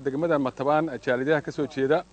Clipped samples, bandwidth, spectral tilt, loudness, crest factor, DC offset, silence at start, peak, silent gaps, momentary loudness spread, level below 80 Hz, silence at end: under 0.1%; 9 kHz; -7 dB/octave; -25 LUFS; 16 dB; under 0.1%; 0 s; -10 dBFS; none; 3 LU; -60 dBFS; 0.1 s